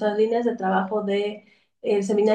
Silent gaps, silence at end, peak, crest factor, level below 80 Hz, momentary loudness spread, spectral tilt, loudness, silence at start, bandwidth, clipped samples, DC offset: none; 0 s; -10 dBFS; 14 dB; -74 dBFS; 10 LU; -6 dB/octave; -24 LUFS; 0 s; 9.2 kHz; under 0.1%; under 0.1%